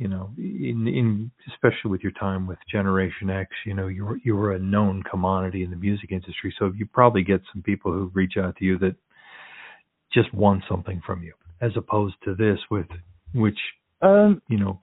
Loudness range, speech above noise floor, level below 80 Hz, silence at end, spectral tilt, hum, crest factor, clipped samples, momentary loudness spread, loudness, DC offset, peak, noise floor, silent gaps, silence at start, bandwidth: 3 LU; 27 dB; -56 dBFS; 0.05 s; -6.5 dB/octave; none; 24 dB; under 0.1%; 13 LU; -24 LUFS; under 0.1%; 0 dBFS; -49 dBFS; none; 0 s; 4.1 kHz